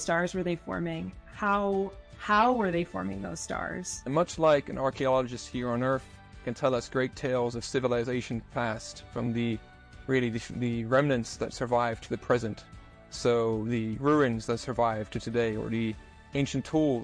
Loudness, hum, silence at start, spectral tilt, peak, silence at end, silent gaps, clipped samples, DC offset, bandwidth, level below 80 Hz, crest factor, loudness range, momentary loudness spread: -30 LUFS; none; 0 s; -5.5 dB/octave; -12 dBFS; 0 s; none; under 0.1%; under 0.1%; 10.5 kHz; -52 dBFS; 18 dB; 3 LU; 11 LU